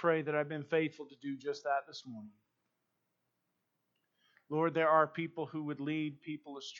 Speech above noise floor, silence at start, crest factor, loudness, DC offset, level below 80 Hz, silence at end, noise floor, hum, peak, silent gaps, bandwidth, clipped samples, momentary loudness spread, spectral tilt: 48 dB; 0 s; 22 dB; -35 LUFS; under 0.1%; under -90 dBFS; 0 s; -84 dBFS; none; -16 dBFS; none; 7.4 kHz; under 0.1%; 17 LU; -6.5 dB/octave